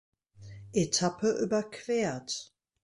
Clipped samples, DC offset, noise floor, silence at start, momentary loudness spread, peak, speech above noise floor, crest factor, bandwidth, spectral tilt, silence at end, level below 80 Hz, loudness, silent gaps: under 0.1%; under 0.1%; -49 dBFS; 0.4 s; 10 LU; -14 dBFS; 19 dB; 18 dB; 11.5 kHz; -4 dB/octave; 0.4 s; -64 dBFS; -31 LUFS; none